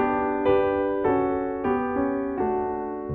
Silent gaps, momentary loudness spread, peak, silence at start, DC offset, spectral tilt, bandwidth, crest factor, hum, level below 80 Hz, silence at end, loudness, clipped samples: none; 5 LU; -10 dBFS; 0 s; under 0.1%; -10 dB/octave; 4.3 kHz; 14 dB; none; -48 dBFS; 0 s; -25 LUFS; under 0.1%